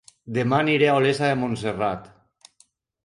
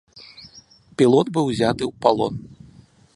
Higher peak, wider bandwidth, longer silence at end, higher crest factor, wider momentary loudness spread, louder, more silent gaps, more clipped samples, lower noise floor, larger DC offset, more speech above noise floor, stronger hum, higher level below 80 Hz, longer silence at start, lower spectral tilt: second, -6 dBFS vs -2 dBFS; about the same, 11.5 kHz vs 11.5 kHz; first, 1 s vs 0.6 s; about the same, 16 dB vs 20 dB; second, 9 LU vs 21 LU; about the same, -22 LUFS vs -20 LUFS; neither; neither; first, -62 dBFS vs -50 dBFS; neither; first, 40 dB vs 31 dB; neither; about the same, -58 dBFS vs -54 dBFS; about the same, 0.25 s vs 0.15 s; about the same, -6 dB/octave vs -6.5 dB/octave